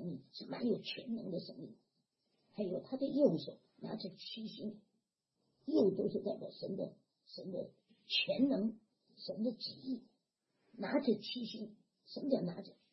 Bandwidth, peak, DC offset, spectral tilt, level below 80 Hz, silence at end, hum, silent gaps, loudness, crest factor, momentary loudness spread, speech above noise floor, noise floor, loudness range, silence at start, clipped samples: 6 kHz; -18 dBFS; under 0.1%; -7.5 dB/octave; -84 dBFS; 0.2 s; none; none; -39 LUFS; 22 dB; 18 LU; 47 dB; -85 dBFS; 3 LU; 0 s; under 0.1%